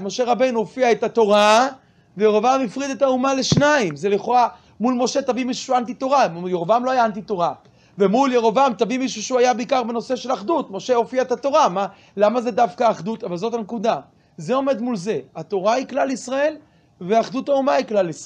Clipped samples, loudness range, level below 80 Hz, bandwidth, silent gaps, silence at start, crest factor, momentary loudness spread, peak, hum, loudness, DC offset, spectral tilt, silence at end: under 0.1%; 5 LU; -60 dBFS; 10.5 kHz; none; 0 s; 16 dB; 8 LU; -4 dBFS; none; -20 LUFS; under 0.1%; -4.5 dB/octave; 0 s